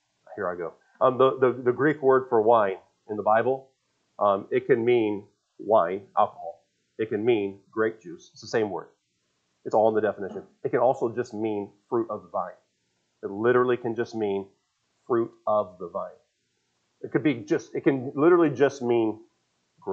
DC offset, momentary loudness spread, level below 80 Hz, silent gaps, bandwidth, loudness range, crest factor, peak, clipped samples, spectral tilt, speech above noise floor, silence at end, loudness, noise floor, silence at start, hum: under 0.1%; 16 LU; -78 dBFS; none; 7.4 kHz; 6 LU; 20 dB; -6 dBFS; under 0.1%; -7 dB/octave; 50 dB; 0 s; -25 LUFS; -74 dBFS; 0.3 s; none